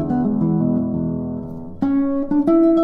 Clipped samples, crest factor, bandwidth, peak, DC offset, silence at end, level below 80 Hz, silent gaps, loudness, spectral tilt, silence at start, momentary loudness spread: under 0.1%; 12 dB; 3.9 kHz; -6 dBFS; under 0.1%; 0 s; -44 dBFS; none; -19 LUFS; -11.5 dB/octave; 0 s; 12 LU